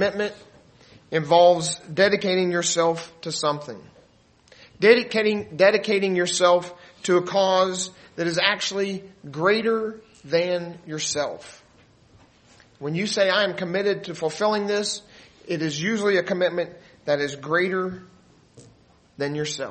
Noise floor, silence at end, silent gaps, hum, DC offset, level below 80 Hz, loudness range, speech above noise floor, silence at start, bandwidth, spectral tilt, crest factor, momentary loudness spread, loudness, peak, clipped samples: -57 dBFS; 0 s; none; none; under 0.1%; -66 dBFS; 6 LU; 35 dB; 0 s; 8.8 kHz; -3.5 dB/octave; 22 dB; 14 LU; -23 LUFS; -2 dBFS; under 0.1%